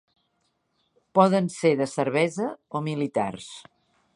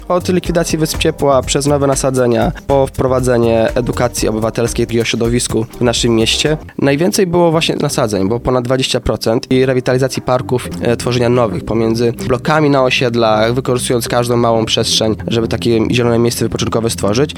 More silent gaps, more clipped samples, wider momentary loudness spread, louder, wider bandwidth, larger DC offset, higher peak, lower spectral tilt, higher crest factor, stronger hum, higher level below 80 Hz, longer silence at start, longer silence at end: neither; neither; first, 14 LU vs 4 LU; second, -25 LUFS vs -14 LUFS; second, 11.5 kHz vs 18.5 kHz; neither; second, -4 dBFS vs 0 dBFS; about the same, -6 dB/octave vs -5 dB/octave; first, 22 dB vs 14 dB; neither; second, -70 dBFS vs -32 dBFS; first, 1.15 s vs 0 s; first, 0.55 s vs 0 s